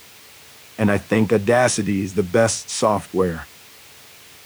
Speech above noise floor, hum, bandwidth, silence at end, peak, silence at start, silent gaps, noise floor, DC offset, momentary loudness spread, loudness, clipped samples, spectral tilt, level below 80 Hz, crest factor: 26 dB; none; over 20 kHz; 1 s; -4 dBFS; 0.8 s; none; -45 dBFS; under 0.1%; 7 LU; -20 LUFS; under 0.1%; -5 dB/octave; -52 dBFS; 16 dB